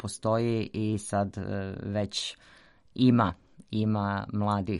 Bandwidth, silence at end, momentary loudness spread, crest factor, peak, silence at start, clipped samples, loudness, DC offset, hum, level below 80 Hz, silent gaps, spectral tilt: 11.5 kHz; 0 s; 12 LU; 18 dB; -10 dBFS; 0 s; under 0.1%; -29 LUFS; under 0.1%; none; -58 dBFS; none; -6 dB/octave